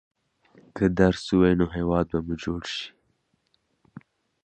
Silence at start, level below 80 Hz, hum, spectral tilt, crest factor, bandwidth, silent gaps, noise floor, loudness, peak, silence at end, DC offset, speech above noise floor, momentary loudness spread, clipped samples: 0.75 s; -44 dBFS; none; -7 dB/octave; 22 dB; 9 kHz; none; -71 dBFS; -24 LUFS; -6 dBFS; 0.45 s; under 0.1%; 48 dB; 12 LU; under 0.1%